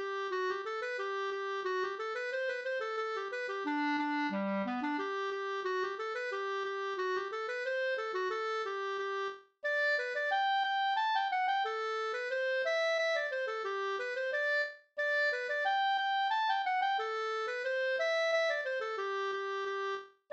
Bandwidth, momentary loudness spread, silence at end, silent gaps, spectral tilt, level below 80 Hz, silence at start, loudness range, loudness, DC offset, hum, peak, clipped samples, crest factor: 8.6 kHz; 6 LU; 0.25 s; none; -3.5 dB/octave; -88 dBFS; 0 s; 4 LU; -34 LUFS; under 0.1%; none; -20 dBFS; under 0.1%; 14 dB